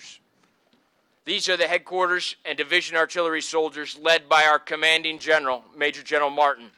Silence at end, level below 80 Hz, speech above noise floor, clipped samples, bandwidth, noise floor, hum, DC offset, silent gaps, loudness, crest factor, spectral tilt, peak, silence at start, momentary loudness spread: 0.1 s; -74 dBFS; 43 dB; under 0.1%; 15 kHz; -66 dBFS; none; under 0.1%; none; -22 LUFS; 18 dB; -1.5 dB/octave; -6 dBFS; 0 s; 9 LU